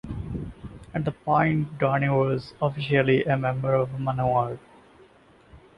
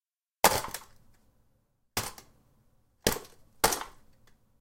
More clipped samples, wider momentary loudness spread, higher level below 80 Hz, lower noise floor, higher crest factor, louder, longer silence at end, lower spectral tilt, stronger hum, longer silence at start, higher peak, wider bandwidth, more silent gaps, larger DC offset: neither; second, 12 LU vs 16 LU; about the same, -48 dBFS vs -52 dBFS; second, -55 dBFS vs -71 dBFS; second, 18 dB vs 32 dB; first, -25 LUFS vs -30 LUFS; second, 0.2 s vs 0.7 s; first, -9 dB/octave vs -2 dB/octave; neither; second, 0.05 s vs 0.45 s; second, -8 dBFS vs -4 dBFS; second, 5.8 kHz vs 17 kHz; neither; neither